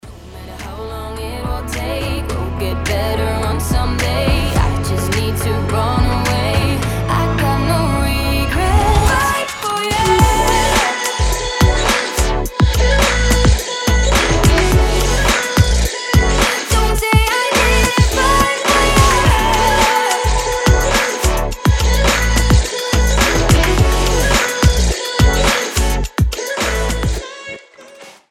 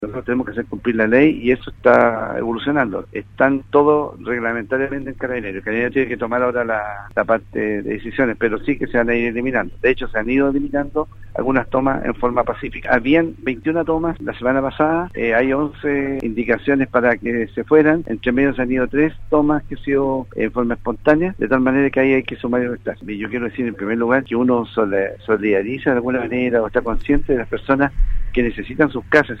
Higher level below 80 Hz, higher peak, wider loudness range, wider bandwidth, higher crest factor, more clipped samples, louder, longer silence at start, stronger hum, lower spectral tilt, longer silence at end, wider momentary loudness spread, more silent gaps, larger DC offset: first, -18 dBFS vs -34 dBFS; about the same, 0 dBFS vs 0 dBFS; about the same, 5 LU vs 3 LU; first, 16.5 kHz vs 6.2 kHz; about the same, 14 dB vs 18 dB; neither; first, -15 LUFS vs -19 LUFS; about the same, 0.05 s vs 0 s; neither; second, -4 dB/octave vs -8.5 dB/octave; first, 0.2 s vs 0 s; about the same, 8 LU vs 8 LU; neither; neither